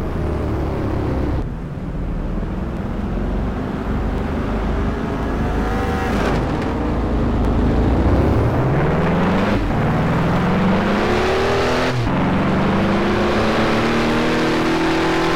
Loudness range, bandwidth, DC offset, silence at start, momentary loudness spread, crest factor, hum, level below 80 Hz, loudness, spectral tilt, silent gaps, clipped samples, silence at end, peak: 6 LU; 15.5 kHz; 0.8%; 0 s; 7 LU; 10 dB; none; -26 dBFS; -19 LUFS; -7 dB/octave; none; under 0.1%; 0 s; -8 dBFS